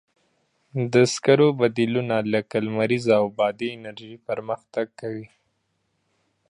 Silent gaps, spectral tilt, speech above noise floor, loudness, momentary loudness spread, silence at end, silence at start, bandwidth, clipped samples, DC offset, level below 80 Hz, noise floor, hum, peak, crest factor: none; -5.5 dB/octave; 50 dB; -23 LUFS; 16 LU; 1.25 s; 0.75 s; 11 kHz; under 0.1%; under 0.1%; -66 dBFS; -72 dBFS; none; -4 dBFS; 20 dB